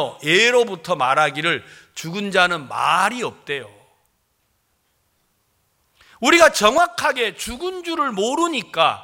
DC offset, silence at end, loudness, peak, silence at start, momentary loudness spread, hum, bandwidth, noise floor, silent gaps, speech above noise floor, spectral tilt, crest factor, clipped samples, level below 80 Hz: under 0.1%; 0 s; -18 LUFS; 0 dBFS; 0 s; 14 LU; none; 17 kHz; -67 dBFS; none; 48 dB; -2.5 dB/octave; 20 dB; under 0.1%; -54 dBFS